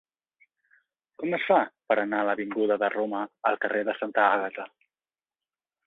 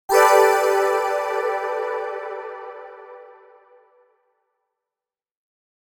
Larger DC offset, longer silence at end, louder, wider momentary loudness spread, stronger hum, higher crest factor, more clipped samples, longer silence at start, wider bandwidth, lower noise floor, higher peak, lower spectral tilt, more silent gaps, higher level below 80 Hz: neither; second, 1.2 s vs 2.75 s; second, -26 LUFS vs -20 LUFS; second, 9 LU vs 23 LU; neither; about the same, 22 dB vs 20 dB; neither; first, 1.2 s vs 0.1 s; second, 4.1 kHz vs 19 kHz; about the same, under -90 dBFS vs under -90 dBFS; second, -8 dBFS vs -2 dBFS; first, -7.5 dB/octave vs -0.5 dB/octave; neither; second, -78 dBFS vs -70 dBFS